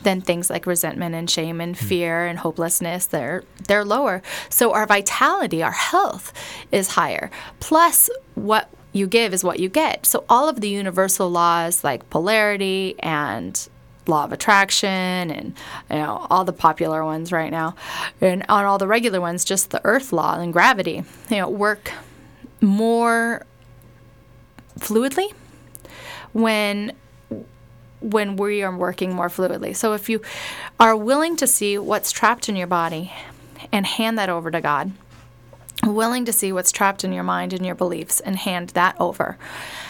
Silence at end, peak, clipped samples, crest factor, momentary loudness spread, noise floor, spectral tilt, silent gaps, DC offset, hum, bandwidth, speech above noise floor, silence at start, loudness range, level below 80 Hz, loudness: 0 s; -2 dBFS; under 0.1%; 20 dB; 12 LU; -49 dBFS; -3 dB/octave; none; under 0.1%; none; 19.5 kHz; 28 dB; 0 s; 6 LU; -56 dBFS; -20 LUFS